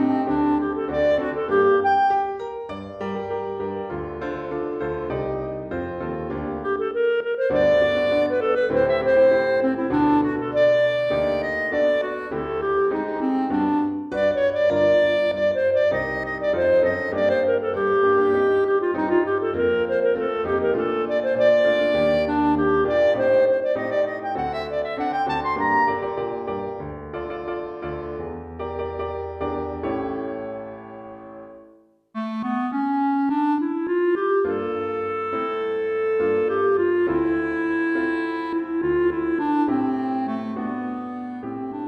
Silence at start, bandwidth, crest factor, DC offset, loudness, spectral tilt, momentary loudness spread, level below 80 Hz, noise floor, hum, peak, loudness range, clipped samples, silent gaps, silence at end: 0 s; 6.8 kHz; 14 dB; under 0.1%; -22 LUFS; -7.5 dB/octave; 12 LU; -50 dBFS; -53 dBFS; none; -8 dBFS; 9 LU; under 0.1%; none; 0 s